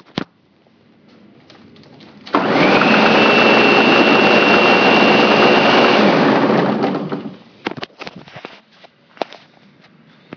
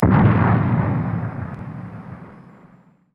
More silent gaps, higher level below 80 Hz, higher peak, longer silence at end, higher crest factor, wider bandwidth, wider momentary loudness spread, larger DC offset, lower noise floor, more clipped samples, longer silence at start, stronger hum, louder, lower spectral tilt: neither; second, -56 dBFS vs -38 dBFS; about the same, 0 dBFS vs -2 dBFS; first, 1.15 s vs 0.75 s; about the same, 14 dB vs 18 dB; first, 5.4 kHz vs 4.4 kHz; second, 19 LU vs 22 LU; neither; about the same, -54 dBFS vs -51 dBFS; neither; first, 0.15 s vs 0 s; neither; first, -11 LUFS vs -19 LUFS; second, -5.5 dB/octave vs -11.5 dB/octave